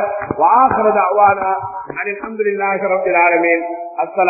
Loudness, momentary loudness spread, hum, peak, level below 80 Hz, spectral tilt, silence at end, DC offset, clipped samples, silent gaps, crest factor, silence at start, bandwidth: -15 LUFS; 11 LU; none; 0 dBFS; -52 dBFS; -13.5 dB/octave; 0 s; under 0.1%; under 0.1%; none; 14 dB; 0 s; 2.7 kHz